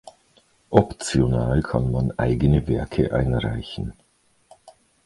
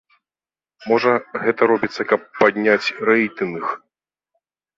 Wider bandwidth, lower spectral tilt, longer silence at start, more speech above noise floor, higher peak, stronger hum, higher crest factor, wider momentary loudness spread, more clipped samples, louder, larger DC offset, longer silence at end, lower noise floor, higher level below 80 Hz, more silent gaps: first, 11.5 kHz vs 7.6 kHz; about the same, -7 dB/octave vs -6 dB/octave; second, 0.05 s vs 0.8 s; second, 39 dB vs over 72 dB; about the same, 0 dBFS vs -2 dBFS; neither; about the same, 22 dB vs 18 dB; about the same, 9 LU vs 9 LU; neither; second, -22 LUFS vs -19 LUFS; neither; second, 0.35 s vs 1 s; second, -60 dBFS vs under -90 dBFS; first, -34 dBFS vs -64 dBFS; neither